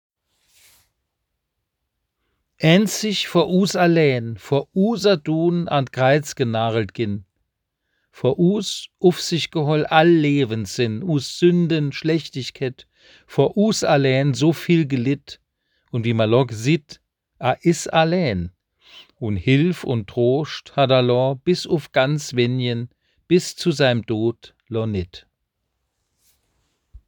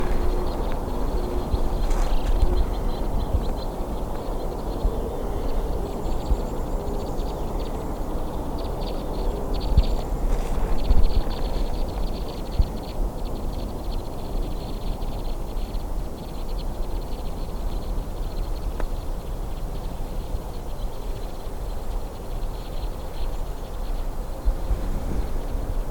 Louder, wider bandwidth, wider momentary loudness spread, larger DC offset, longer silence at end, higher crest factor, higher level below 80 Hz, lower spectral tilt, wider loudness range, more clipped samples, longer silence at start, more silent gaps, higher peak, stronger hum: first, -20 LUFS vs -30 LUFS; about the same, over 20 kHz vs 19 kHz; first, 10 LU vs 7 LU; neither; about the same, 0.1 s vs 0 s; about the same, 20 dB vs 18 dB; second, -58 dBFS vs -26 dBFS; about the same, -6 dB/octave vs -6.5 dB/octave; second, 4 LU vs 7 LU; neither; first, 2.6 s vs 0 s; neither; first, 0 dBFS vs -4 dBFS; neither